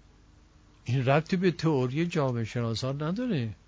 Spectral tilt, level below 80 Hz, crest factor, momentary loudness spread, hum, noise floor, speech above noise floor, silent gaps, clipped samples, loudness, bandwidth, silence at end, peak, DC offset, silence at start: -7 dB/octave; -56 dBFS; 20 dB; 6 LU; none; -57 dBFS; 30 dB; none; under 0.1%; -28 LUFS; 8 kHz; 0.15 s; -10 dBFS; under 0.1%; 0.85 s